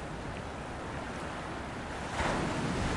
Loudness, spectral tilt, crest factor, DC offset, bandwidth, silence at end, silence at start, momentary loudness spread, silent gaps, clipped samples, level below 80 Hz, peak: -36 LUFS; -5 dB/octave; 16 dB; under 0.1%; 11.5 kHz; 0 s; 0 s; 8 LU; none; under 0.1%; -46 dBFS; -18 dBFS